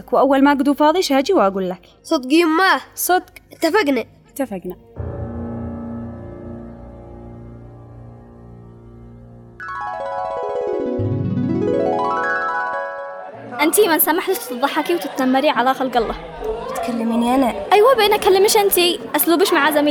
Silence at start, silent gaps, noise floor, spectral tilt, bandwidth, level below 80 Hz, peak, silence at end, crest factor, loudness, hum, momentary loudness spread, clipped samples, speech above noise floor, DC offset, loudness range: 0.1 s; none; -40 dBFS; -4 dB/octave; over 20 kHz; -46 dBFS; -2 dBFS; 0 s; 16 dB; -17 LUFS; none; 19 LU; under 0.1%; 24 dB; under 0.1%; 17 LU